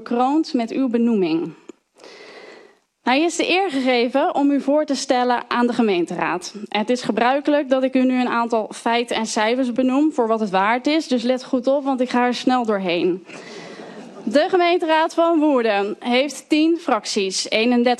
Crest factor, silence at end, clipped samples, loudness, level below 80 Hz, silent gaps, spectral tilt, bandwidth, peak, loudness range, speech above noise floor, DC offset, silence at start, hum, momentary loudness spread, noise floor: 14 dB; 0.05 s; under 0.1%; -19 LUFS; -70 dBFS; none; -4 dB/octave; 12 kHz; -4 dBFS; 3 LU; 31 dB; under 0.1%; 0 s; none; 6 LU; -50 dBFS